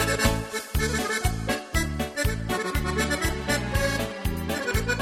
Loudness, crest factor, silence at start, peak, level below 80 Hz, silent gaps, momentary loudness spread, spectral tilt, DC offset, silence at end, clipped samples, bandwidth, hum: -27 LUFS; 18 dB; 0 s; -8 dBFS; -32 dBFS; none; 4 LU; -4 dB/octave; under 0.1%; 0 s; under 0.1%; 16 kHz; none